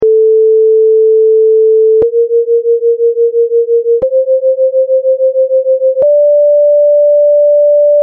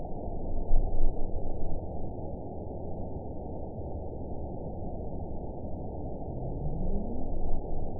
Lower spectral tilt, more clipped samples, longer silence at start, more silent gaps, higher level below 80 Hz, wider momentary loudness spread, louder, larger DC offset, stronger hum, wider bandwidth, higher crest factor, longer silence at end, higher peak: second, -6.5 dB/octave vs -16 dB/octave; neither; about the same, 0 s vs 0 s; neither; second, -56 dBFS vs -32 dBFS; about the same, 3 LU vs 5 LU; first, -8 LUFS vs -38 LUFS; second, under 0.1% vs 0.7%; neither; first, 1.2 kHz vs 1 kHz; second, 4 dB vs 18 dB; about the same, 0 s vs 0 s; first, -4 dBFS vs -10 dBFS